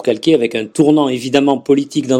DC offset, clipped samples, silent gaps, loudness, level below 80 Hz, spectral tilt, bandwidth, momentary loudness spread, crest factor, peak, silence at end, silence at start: under 0.1%; under 0.1%; none; -14 LUFS; -56 dBFS; -5.5 dB/octave; 12 kHz; 3 LU; 14 dB; 0 dBFS; 0 s; 0 s